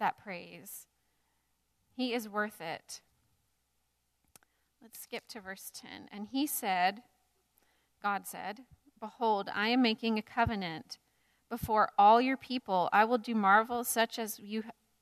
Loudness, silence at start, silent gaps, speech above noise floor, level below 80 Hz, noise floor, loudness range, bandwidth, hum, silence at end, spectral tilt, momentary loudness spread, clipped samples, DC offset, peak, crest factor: -31 LUFS; 0 s; none; 47 dB; -64 dBFS; -79 dBFS; 15 LU; 14 kHz; none; 0.3 s; -3.5 dB/octave; 22 LU; under 0.1%; under 0.1%; -12 dBFS; 22 dB